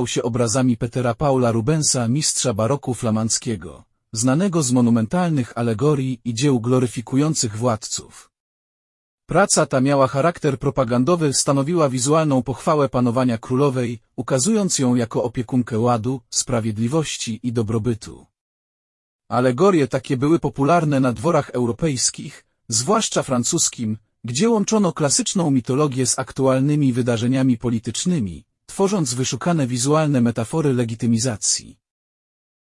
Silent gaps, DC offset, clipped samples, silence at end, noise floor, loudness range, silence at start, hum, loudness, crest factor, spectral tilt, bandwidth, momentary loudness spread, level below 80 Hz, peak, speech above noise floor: 8.40-9.18 s, 18.41-19.19 s; under 0.1%; under 0.1%; 0.9 s; under -90 dBFS; 3 LU; 0 s; none; -20 LUFS; 16 dB; -5 dB/octave; 12 kHz; 6 LU; -50 dBFS; -4 dBFS; over 71 dB